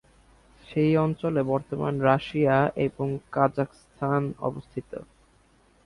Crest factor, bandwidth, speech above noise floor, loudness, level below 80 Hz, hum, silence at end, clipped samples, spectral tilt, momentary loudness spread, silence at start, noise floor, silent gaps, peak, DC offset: 20 dB; 11 kHz; 35 dB; -26 LUFS; -56 dBFS; none; 0.8 s; under 0.1%; -8.5 dB/octave; 13 LU; 0.7 s; -61 dBFS; none; -6 dBFS; under 0.1%